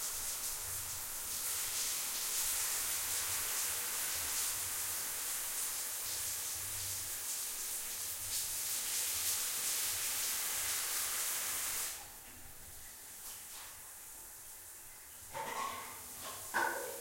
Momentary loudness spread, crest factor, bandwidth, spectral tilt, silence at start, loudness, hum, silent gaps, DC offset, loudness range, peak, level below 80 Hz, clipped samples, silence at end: 15 LU; 18 dB; 16.5 kHz; 1 dB/octave; 0 s; -36 LUFS; none; none; under 0.1%; 11 LU; -22 dBFS; -64 dBFS; under 0.1%; 0 s